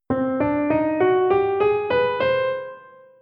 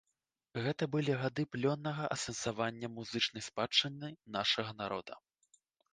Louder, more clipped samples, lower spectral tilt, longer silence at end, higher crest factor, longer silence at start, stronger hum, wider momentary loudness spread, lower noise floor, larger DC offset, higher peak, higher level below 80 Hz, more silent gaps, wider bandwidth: first, -21 LUFS vs -36 LUFS; neither; first, -9 dB/octave vs -4 dB/octave; second, 0.4 s vs 0.75 s; second, 14 dB vs 22 dB; second, 0.1 s vs 0.55 s; neither; second, 6 LU vs 12 LU; second, -44 dBFS vs -87 dBFS; neither; first, -8 dBFS vs -16 dBFS; first, -52 dBFS vs -72 dBFS; neither; second, 5.2 kHz vs 10 kHz